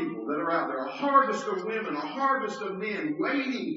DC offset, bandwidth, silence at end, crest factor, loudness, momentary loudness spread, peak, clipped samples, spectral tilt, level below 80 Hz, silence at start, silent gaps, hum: under 0.1%; 7.6 kHz; 0 s; 18 dB; -28 LUFS; 9 LU; -10 dBFS; under 0.1%; -3 dB/octave; -82 dBFS; 0 s; none; none